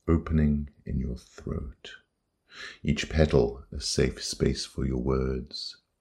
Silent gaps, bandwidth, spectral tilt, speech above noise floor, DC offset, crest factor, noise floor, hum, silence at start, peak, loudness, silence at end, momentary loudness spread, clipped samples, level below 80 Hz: none; 12.5 kHz; -5.5 dB/octave; 41 dB; under 0.1%; 24 dB; -69 dBFS; none; 0.05 s; -6 dBFS; -29 LUFS; 0.25 s; 15 LU; under 0.1%; -36 dBFS